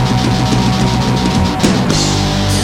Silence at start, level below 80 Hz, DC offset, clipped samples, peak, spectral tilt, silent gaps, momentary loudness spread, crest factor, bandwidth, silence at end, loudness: 0 s; -26 dBFS; under 0.1%; under 0.1%; 0 dBFS; -5 dB/octave; none; 1 LU; 12 dB; 16 kHz; 0 s; -13 LUFS